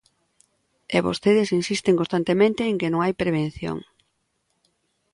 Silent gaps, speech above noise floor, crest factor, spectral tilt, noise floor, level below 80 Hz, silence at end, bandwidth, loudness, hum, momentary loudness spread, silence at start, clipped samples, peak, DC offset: none; 51 dB; 18 dB; -6 dB/octave; -72 dBFS; -56 dBFS; 1.3 s; 11.5 kHz; -22 LUFS; none; 8 LU; 0.9 s; under 0.1%; -6 dBFS; under 0.1%